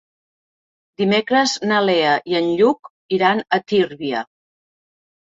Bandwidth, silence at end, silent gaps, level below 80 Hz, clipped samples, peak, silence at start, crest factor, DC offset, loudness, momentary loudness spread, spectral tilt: 8 kHz; 1.15 s; 2.79-2.83 s, 2.90-3.09 s; -64 dBFS; under 0.1%; -4 dBFS; 1 s; 16 dB; under 0.1%; -18 LUFS; 9 LU; -4.5 dB/octave